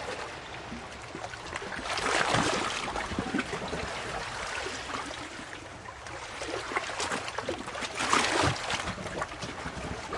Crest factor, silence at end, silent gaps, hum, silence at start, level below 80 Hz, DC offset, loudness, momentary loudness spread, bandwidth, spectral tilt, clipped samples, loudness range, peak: 24 dB; 0 s; none; none; 0 s; -52 dBFS; under 0.1%; -32 LUFS; 14 LU; 11.5 kHz; -3 dB/octave; under 0.1%; 5 LU; -8 dBFS